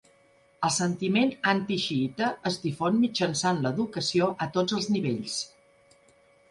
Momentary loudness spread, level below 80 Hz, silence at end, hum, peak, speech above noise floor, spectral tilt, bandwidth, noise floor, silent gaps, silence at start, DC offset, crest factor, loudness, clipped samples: 6 LU; -66 dBFS; 1.05 s; none; -10 dBFS; 35 dB; -4.5 dB/octave; 11.5 kHz; -61 dBFS; none; 0.6 s; under 0.1%; 18 dB; -27 LUFS; under 0.1%